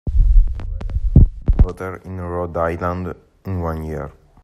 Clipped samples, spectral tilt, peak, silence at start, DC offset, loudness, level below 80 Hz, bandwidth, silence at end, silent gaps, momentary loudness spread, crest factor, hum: under 0.1%; -10 dB/octave; 0 dBFS; 0.05 s; under 0.1%; -21 LUFS; -18 dBFS; 3.4 kHz; 0.35 s; none; 15 LU; 16 dB; none